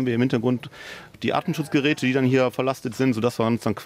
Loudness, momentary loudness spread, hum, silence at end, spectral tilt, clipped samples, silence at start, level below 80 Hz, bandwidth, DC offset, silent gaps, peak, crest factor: -23 LUFS; 9 LU; none; 0 s; -6.5 dB/octave; under 0.1%; 0 s; -62 dBFS; 15.5 kHz; under 0.1%; none; -8 dBFS; 16 dB